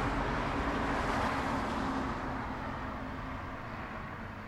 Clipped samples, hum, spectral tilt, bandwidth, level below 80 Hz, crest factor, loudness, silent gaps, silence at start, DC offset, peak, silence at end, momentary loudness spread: under 0.1%; none; -6 dB/octave; 14 kHz; -44 dBFS; 14 dB; -35 LUFS; none; 0 s; under 0.1%; -20 dBFS; 0 s; 9 LU